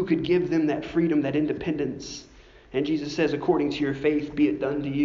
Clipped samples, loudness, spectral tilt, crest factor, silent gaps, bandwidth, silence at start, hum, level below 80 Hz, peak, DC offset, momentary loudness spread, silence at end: under 0.1%; -25 LUFS; -6 dB/octave; 16 dB; none; 7.4 kHz; 0 s; none; -52 dBFS; -8 dBFS; under 0.1%; 7 LU; 0 s